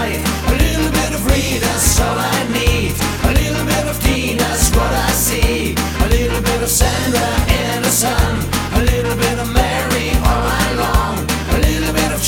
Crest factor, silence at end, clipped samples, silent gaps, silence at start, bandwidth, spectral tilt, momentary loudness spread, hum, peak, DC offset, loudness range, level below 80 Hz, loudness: 16 dB; 0 s; under 0.1%; none; 0 s; 18.5 kHz; -4 dB/octave; 3 LU; none; 0 dBFS; under 0.1%; 1 LU; -20 dBFS; -15 LUFS